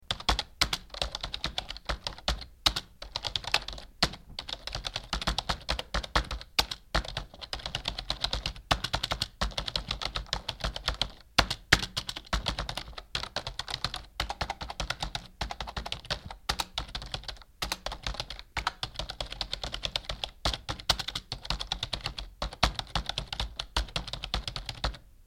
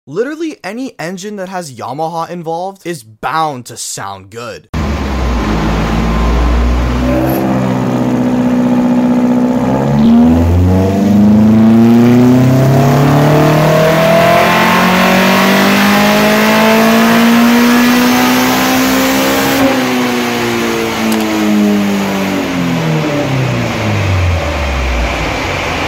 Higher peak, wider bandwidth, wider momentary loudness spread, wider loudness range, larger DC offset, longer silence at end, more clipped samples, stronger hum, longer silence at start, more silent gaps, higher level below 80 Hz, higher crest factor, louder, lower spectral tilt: about the same, 0 dBFS vs 0 dBFS; about the same, 16.5 kHz vs 16.5 kHz; second, 9 LU vs 13 LU; second, 5 LU vs 11 LU; neither; about the same, 0 s vs 0 s; neither; neither; about the same, 0 s vs 0.05 s; second, none vs 4.69-4.73 s; second, -42 dBFS vs -24 dBFS; first, 34 dB vs 10 dB; second, -33 LUFS vs -10 LUFS; second, -2.5 dB/octave vs -5.5 dB/octave